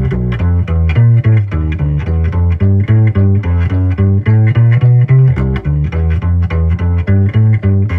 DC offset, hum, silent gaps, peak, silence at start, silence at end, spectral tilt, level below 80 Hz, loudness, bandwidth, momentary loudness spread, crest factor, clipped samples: under 0.1%; none; none; 0 dBFS; 0 s; 0 s; -10.5 dB/octave; -24 dBFS; -12 LUFS; 3.6 kHz; 6 LU; 10 dB; under 0.1%